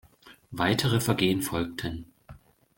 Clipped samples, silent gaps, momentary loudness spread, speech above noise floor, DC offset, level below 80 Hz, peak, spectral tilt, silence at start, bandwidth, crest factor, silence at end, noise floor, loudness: under 0.1%; none; 14 LU; 26 dB; under 0.1%; -52 dBFS; -10 dBFS; -5 dB/octave; 0.25 s; 17 kHz; 20 dB; 0.4 s; -53 dBFS; -27 LUFS